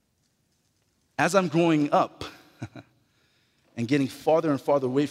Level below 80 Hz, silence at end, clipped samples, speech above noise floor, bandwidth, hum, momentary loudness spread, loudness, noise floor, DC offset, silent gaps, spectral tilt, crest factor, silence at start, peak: -66 dBFS; 0 s; under 0.1%; 48 dB; 15.5 kHz; none; 20 LU; -24 LUFS; -71 dBFS; under 0.1%; none; -6 dB/octave; 20 dB; 1.2 s; -6 dBFS